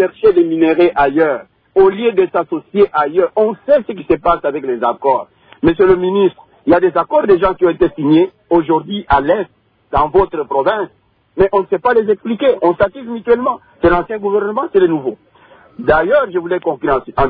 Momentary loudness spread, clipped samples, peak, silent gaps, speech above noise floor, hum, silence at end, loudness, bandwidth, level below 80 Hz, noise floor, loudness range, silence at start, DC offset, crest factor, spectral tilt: 7 LU; under 0.1%; 0 dBFS; none; 32 dB; none; 0 s; -14 LUFS; 4.9 kHz; -38 dBFS; -45 dBFS; 3 LU; 0 s; under 0.1%; 14 dB; -10 dB/octave